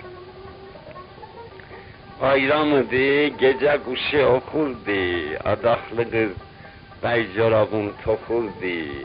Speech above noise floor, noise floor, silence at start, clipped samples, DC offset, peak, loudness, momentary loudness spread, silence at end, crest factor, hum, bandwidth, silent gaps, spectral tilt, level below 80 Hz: 22 dB; -43 dBFS; 0 s; under 0.1%; under 0.1%; -6 dBFS; -21 LUFS; 22 LU; 0 s; 16 dB; none; 5.2 kHz; none; -10.5 dB/octave; -50 dBFS